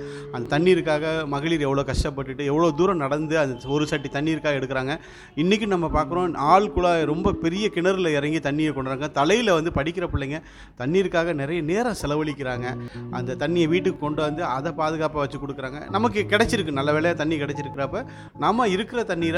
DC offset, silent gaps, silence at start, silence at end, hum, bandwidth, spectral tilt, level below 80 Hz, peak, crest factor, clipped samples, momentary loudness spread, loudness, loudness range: under 0.1%; none; 0 s; 0 s; none; 12.5 kHz; -6 dB/octave; -42 dBFS; -4 dBFS; 20 dB; under 0.1%; 9 LU; -23 LUFS; 3 LU